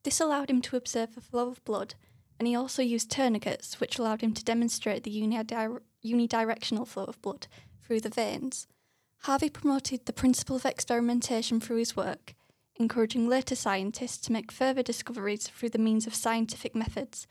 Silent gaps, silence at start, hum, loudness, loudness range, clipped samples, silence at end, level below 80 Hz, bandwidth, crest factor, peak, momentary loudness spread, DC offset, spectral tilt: none; 0.05 s; none; -30 LUFS; 3 LU; under 0.1%; 0.05 s; -62 dBFS; 15 kHz; 16 dB; -14 dBFS; 9 LU; under 0.1%; -3.5 dB/octave